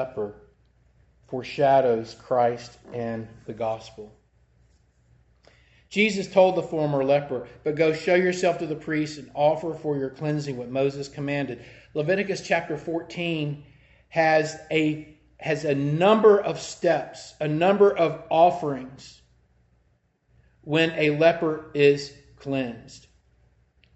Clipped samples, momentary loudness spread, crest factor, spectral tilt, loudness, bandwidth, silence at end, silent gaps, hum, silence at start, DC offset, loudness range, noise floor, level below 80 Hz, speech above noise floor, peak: under 0.1%; 15 LU; 18 dB; -6 dB/octave; -24 LUFS; 8.4 kHz; 1 s; none; none; 0 s; under 0.1%; 6 LU; -67 dBFS; -60 dBFS; 43 dB; -6 dBFS